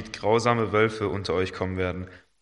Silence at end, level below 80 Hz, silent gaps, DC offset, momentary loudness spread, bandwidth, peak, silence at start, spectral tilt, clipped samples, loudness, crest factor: 0.25 s; -56 dBFS; none; under 0.1%; 8 LU; 10.5 kHz; -6 dBFS; 0 s; -6 dB/octave; under 0.1%; -25 LUFS; 18 dB